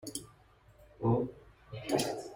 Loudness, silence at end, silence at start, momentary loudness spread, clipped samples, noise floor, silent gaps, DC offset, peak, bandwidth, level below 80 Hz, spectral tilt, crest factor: -35 LUFS; 0 s; 0.05 s; 13 LU; under 0.1%; -62 dBFS; none; under 0.1%; -16 dBFS; 16.5 kHz; -62 dBFS; -5.5 dB/octave; 20 dB